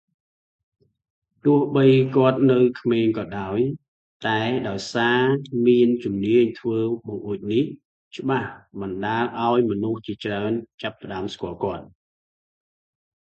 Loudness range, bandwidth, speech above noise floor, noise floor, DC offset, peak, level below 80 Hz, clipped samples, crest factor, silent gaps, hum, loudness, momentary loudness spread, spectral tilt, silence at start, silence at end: 6 LU; 8 kHz; over 69 dB; under -90 dBFS; under 0.1%; -4 dBFS; -58 dBFS; under 0.1%; 18 dB; 3.88-4.20 s, 7.85-8.11 s, 10.74-10.78 s; none; -22 LUFS; 13 LU; -7.5 dB/octave; 1.45 s; 1.4 s